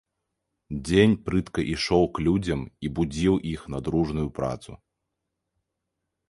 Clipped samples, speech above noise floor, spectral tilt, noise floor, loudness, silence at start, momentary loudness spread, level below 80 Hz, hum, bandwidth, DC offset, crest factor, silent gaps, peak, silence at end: under 0.1%; 57 dB; -6.5 dB/octave; -82 dBFS; -25 LUFS; 0.7 s; 12 LU; -44 dBFS; none; 11.5 kHz; under 0.1%; 22 dB; none; -4 dBFS; 1.55 s